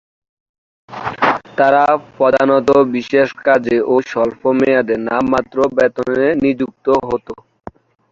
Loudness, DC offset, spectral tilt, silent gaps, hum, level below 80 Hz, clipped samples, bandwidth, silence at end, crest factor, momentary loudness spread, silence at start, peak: -15 LUFS; under 0.1%; -6.5 dB/octave; none; none; -50 dBFS; under 0.1%; 7.6 kHz; 0.8 s; 14 dB; 9 LU; 0.9 s; 0 dBFS